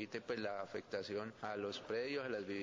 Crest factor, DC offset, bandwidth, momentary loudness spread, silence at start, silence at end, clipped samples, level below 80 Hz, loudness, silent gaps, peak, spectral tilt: 16 dB; under 0.1%; 7.6 kHz; 4 LU; 0 s; 0 s; under 0.1%; -76 dBFS; -43 LUFS; none; -28 dBFS; -5 dB/octave